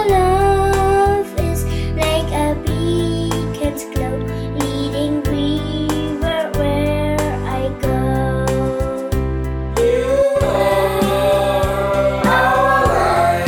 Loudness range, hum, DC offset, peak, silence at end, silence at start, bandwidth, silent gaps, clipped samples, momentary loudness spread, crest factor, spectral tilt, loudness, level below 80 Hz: 5 LU; none; under 0.1%; -2 dBFS; 0 s; 0 s; 18 kHz; none; under 0.1%; 7 LU; 14 dB; -6 dB/octave; -17 LUFS; -26 dBFS